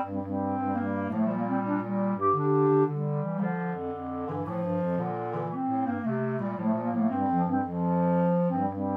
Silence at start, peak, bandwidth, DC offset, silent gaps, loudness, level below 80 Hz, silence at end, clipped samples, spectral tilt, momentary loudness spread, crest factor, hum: 0 s; -14 dBFS; 3.7 kHz; under 0.1%; none; -28 LUFS; -66 dBFS; 0 s; under 0.1%; -11.5 dB/octave; 7 LU; 14 dB; none